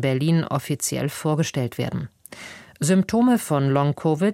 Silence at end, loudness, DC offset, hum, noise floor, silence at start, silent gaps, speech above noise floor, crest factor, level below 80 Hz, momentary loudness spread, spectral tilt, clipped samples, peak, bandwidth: 0 s; -22 LUFS; under 0.1%; none; -41 dBFS; 0 s; none; 20 dB; 14 dB; -56 dBFS; 18 LU; -6 dB/octave; under 0.1%; -8 dBFS; 16.5 kHz